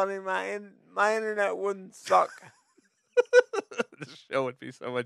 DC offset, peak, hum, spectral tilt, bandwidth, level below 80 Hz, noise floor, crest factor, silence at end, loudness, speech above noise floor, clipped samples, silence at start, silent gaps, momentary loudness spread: under 0.1%; -6 dBFS; none; -4 dB/octave; 12 kHz; -84 dBFS; -68 dBFS; 24 dB; 0 s; -28 LUFS; 38 dB; under 0.1%; 0 s; none; 14 LU